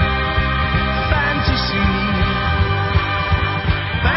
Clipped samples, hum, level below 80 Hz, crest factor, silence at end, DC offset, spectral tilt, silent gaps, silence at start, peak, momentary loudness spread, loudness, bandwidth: under 0.1%; none; -22 dBFS; 14 dB; 0 s; under 0.1%; -9.5 dB/octave; none; 0 s; -4 dBFS; 1 LU; -18 LUFS; 5.8 kHz